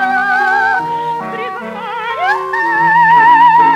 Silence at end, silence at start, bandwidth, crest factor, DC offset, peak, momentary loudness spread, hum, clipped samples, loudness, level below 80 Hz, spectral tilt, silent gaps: 0 s; 0 s; 9.4 kHz; 12 dB; under 0.1%; 0 dBFS; 15 LU; none; under 0.1%; -11 LUFS; -56 dBFS; -4.5 dB/octave; none